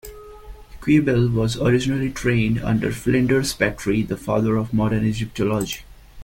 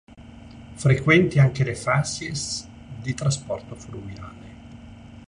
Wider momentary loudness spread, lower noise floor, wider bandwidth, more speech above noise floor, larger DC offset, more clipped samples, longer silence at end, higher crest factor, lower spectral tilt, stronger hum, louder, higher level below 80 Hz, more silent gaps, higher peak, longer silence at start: second, 5 LU vs 26 LU; second, -39 dBFS vs -43 dBFS; first, 17 kHz vs 10.5 kHz; about the same, 20 dB vs 21 dB; neither; neither; about the same, 0 s vs 0.05 s; about the same, 16 dB vs 20 dB; about the same, -6 dB/octave vs -5.5 dB/octave; neither; about the same, -21 LUFS vs -22 LUFS; first, -40 dBFS vs -48 dBFS; neither; about the same, -4 dBFS vs -4 dBFS; about the same, 0.05 s vs 0.1 s